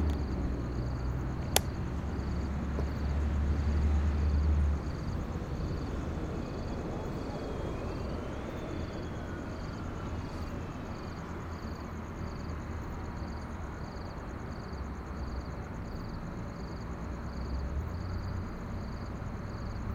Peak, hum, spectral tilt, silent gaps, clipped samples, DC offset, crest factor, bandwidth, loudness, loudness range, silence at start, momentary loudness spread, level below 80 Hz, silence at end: -2 dBFS; none; -6 dB/octave; none; under 0.1%; under 0.1%; 32 dB; 16 kHz; -36 LUFS; 8 LU; 0 s; 10 LU; -38 dBFS; 0 s